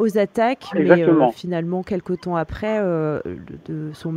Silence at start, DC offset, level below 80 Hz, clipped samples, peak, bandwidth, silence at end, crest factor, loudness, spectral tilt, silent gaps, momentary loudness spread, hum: 0 s; under 0.1%; -48 dBFS; under 0.1%; 0 dBFS; 15 kHz; 0 s; 20 dB; -20 LUFS; -8 dB/octave; none; 15 LU; none